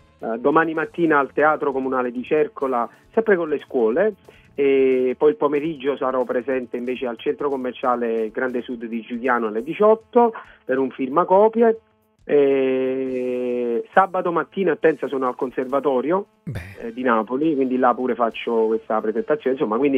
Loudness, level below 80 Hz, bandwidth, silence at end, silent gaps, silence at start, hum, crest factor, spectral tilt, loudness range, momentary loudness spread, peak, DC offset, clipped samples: -21 LUFS; -60 dBFS; 4.6 kHz; 0 s; none; 0.2 s; none; 18 dB; -8 dB/octave; 3 LU; 8 LU; -2 dBFS; under 0.1%; under 0.1%